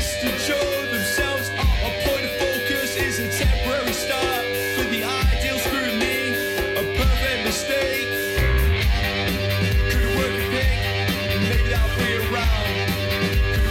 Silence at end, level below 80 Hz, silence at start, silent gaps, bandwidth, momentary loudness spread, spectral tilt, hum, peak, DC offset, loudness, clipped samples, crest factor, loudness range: 0 s; -26 dBFS; 0 s; none; 16.5 kHz; 2 LU; -4 dB/octave; none; -10 dBFS; under 0.1%; -21 LUFS; under 0.1%; 10 dB; 1 LU